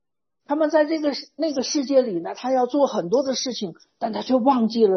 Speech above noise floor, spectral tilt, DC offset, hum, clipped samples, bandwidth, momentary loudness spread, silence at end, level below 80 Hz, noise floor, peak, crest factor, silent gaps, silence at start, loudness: 35 dB; -4.5 dB/octave; under 0.1%; none; under 0.1%; 6.4 kHz; 9 LU; 0 s; -72 dBFS; -56 dBFS; -6 dBFS; 16 dB; none; 0.5 s; -22 LUFS